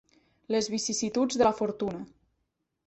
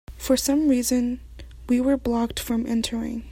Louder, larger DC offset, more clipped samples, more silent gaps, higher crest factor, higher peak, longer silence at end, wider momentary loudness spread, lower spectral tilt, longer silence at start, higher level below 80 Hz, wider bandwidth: second, -28 LUFS vs -23 LUFS; neither; neither; neither; about the same, 20 dB vs 16 dB; about the same, -10 dBFS vs -8 dBFS; first, 0.8 s vs 0 s; about the same, 11 LU vs 9 LU; about the same, -3.5 dB/octave vs -4 dB/octave; first, 0.5 s vs 0.1 s; second, -62 dBFS vs -42 dBFS; second, 8.4 kHz vs 16.5 kHz